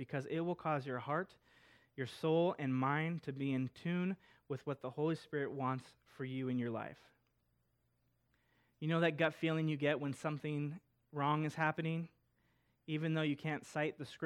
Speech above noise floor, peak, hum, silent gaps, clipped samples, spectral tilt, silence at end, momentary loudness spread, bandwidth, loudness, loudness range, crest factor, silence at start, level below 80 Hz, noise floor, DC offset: 41 dB; -20 dBFS; none; none; under 0.1%; -7 dB/octave; 0 s; 11 LU; 12 kHz; -39 LUFS; 5 LU; 20 dB; 0 s; -80 dBFS; -80 dBFS; under 0.1%